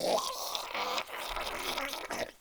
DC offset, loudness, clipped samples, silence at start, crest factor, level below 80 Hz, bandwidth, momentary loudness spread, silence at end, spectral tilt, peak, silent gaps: under 0.1%; -35 LUFS; under 0.1%; 0 s; 22 dB; -56 dBFS; over 20 kHz; 5 LU; 0.05 s; -1 dB/octave; -14 dBFS; none